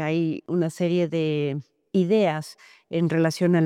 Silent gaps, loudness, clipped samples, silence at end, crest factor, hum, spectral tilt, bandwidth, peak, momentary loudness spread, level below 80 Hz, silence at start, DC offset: none; -24 LUFS; under 0.1%; 0 s; 12 dB; none; -7 dB/octave; 13 kHz; -10 dBFS; 10 LU; -72 dBFS; 0 s; under 0.1%